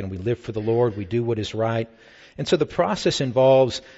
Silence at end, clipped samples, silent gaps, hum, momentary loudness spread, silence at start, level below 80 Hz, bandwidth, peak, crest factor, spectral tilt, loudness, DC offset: 0.05 s; under 0.1%; none; none; 10 LU; 0 s; -52 dBFS; 8 kHz; -6 dBFS; 16 dB; -6 dB/octave; -22 LUFS; under 0.1%